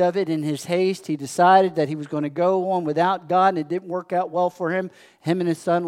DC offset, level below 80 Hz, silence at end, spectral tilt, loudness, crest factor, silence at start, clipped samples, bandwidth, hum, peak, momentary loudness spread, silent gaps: under 0.1%; -78 dBFS; 0 s; -6 dB/octave; -22 LUFS; 18 dB; 0 s; under 0.1%; 15.5 kHz; none; -2 dBFS; 11 LU; none